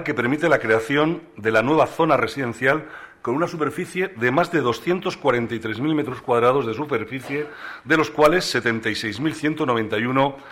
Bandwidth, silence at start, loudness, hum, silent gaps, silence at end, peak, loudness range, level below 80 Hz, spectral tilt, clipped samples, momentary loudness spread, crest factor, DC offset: 16 kHz; 0 s; -21 LUFS; none; none; 0 s; 0 dBFS; 2 LU; -54 dBFS; -5.5 dB/octave; under 0.1%; 8 LU; 22 dB; under 0.1%